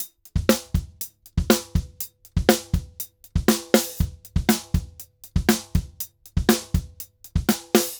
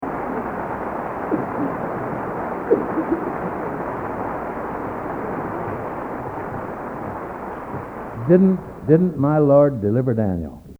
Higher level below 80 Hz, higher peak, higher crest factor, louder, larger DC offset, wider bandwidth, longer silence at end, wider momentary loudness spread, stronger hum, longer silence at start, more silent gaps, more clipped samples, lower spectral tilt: first, -32 dBFS vs -46 dBFS; about the same, 0 dBFS vs 0 dBFS; about the same, 24 dB vs 22 dB; about the same, -24 LUFS vs -22 LUFS; neither; first, over 20 kHz vs 4.5 kHz; about the same, 0 s vs 0.05 s; about the same, 14 LU vs 14 LU; neither; about the same, 0 s vs 0 s; neither; neither; second, -4.5 dB/octave vs -10.5 dB/octave